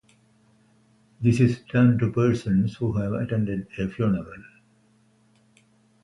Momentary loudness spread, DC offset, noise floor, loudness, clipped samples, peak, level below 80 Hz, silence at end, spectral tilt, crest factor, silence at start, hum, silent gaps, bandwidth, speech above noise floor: 9 LU; under 0.1%; -61 dBFS; -24 LUFS; under 0.1%; -6 dBFS; -50 dBFS; 1.6 s; -8.5 dB/octave; 18 dB; 1.2 s; none; none; 11.5 kHz; 39 dB